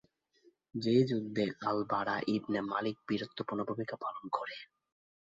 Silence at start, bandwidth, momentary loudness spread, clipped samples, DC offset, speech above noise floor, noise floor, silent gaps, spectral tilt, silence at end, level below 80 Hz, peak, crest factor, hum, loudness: 0.75 s; 7.8 kHz; 10 LU; under 0.1%; under 0.1%; 35 dB; -69 dBFS; none; -7 dB/octave; 0.65 s; -74 dBFS; -16 dBFS; 20 dB; none; -35 LUFS